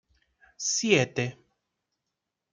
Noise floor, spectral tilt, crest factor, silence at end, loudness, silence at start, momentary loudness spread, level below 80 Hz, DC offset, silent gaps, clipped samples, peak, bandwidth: -85 dBFS; -3.5 dB/octave; 24 dB; 1.2 s; -26 LUFS; 0.6 s; 10 LU; -72 dBFS; under 0.1%; none; under 0.1%; -8 dBFS; 10.5 kHz